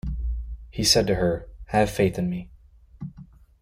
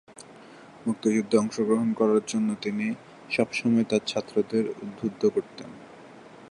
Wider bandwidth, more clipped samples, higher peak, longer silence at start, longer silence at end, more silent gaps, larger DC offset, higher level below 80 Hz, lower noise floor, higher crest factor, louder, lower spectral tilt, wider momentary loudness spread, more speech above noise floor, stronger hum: first, 16.5 kHz vs 11 kHz; neither; about the same, -6 dBFS vs -6 dBFS; about the same, 0.05 s vs 0.1 s; first, 0.35 s vs 0.05 s; neither; neither; first, -36 dBFS vs -68 dBFS; about the same, -48 dBFS vs -48 dBFS; about the same, 20 dB vs 20 dB; about the same, -24 LUFS vs -26 LUFS; second, -4 dB/octave vs -5.5 dB/octave; about the same, 21 LU vs 20 LU; about the same, 25 dB vs 23 dB; neither